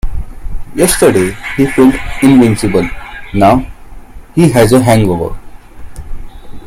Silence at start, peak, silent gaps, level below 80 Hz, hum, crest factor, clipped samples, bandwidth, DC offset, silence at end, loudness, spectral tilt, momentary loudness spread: 0.05 s; 0 dBFS; none; -24 dBFS; none; 10 dB; 0.3%; 16 kHz; under 0.1%; 0 s; -10 LUFS; -6 dB/octave; 20 LU